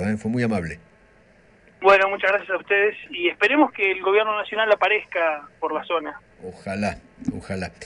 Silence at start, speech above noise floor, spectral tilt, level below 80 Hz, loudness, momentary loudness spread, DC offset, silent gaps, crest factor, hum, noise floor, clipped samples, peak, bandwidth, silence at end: 0 s; 32 dB; -5.5 dB/octave; -54 dBFS; -21 LUFS; 15 LU; under 0.1%; none; 20 dB; none; -54 dBFS; under 0.1%; -4 dBFS; 11 kHz; 0 s